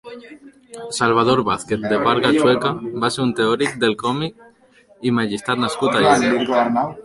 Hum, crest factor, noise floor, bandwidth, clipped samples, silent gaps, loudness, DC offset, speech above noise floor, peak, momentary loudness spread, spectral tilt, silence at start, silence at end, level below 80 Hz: none; 18 dB; -52 dBFS; 11.5 kHz; under 0.1%; none; -18 LUFS; under 0.1%; 34 dB; -2 dBFS; 10 LU; -5 dB/octave; 0.05 s; 0.05 s; -54 dBFS